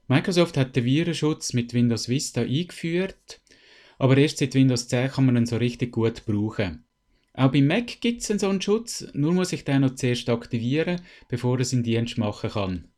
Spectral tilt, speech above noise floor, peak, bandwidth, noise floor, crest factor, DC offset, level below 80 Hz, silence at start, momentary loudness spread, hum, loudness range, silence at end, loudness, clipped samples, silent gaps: -6 dB/octave; 42 dB; -6 dBFS; 13 kHz; -66 dBFS; 18 dB; under 0.1%; -54 dBFS; 0.1 s; 7 LU; none; 2 LU; 0.15 s; -24 LUFS; under 0.1%; none